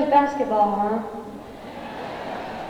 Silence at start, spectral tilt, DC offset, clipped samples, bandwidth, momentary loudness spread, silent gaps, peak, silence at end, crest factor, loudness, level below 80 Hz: 0 s; -6.5 dB/octave; under 0.1%; under 0.1%; 12.5 kHz; 18 LU; none; -6 dBFS; 0 s; 18 dB; -24 LUFS; -54 dBFS